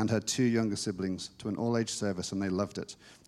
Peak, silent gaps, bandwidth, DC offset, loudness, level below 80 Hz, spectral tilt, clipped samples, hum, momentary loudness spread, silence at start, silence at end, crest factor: -16 dBFS; none; 14.5 kHz; under 0.1%; -32 LUFS; -66 dBFS; -5 dB/octave; under 0.1%; none; 9 LU; 0 s; 0.15 s; 16 dB